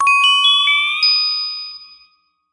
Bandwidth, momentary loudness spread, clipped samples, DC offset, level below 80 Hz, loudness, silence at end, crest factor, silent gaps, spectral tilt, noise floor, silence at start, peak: 11.5 kHz; 14 LU; under 0.1%; under 0.1%; -70 dBFS; -12 LUFS; 0.7 s; 14 dB; none; 5.5 dB/octave; -57 dBFS; 0 s; -2 dBFS